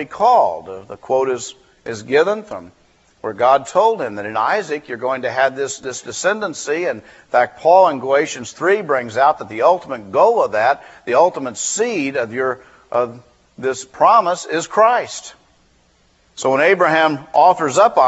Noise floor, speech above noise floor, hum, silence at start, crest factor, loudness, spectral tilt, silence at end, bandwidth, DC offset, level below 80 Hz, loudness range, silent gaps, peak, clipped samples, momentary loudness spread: -56 dBFS; 40 dB; none; 0 s; 16 dB; -17 LUFS; -3.5 dB/octave; 0 s; 8.2 kHz; under 0.1%; -62 dBFS; 4 LU; none; 0 dBFS; under 0.1%; 13 LU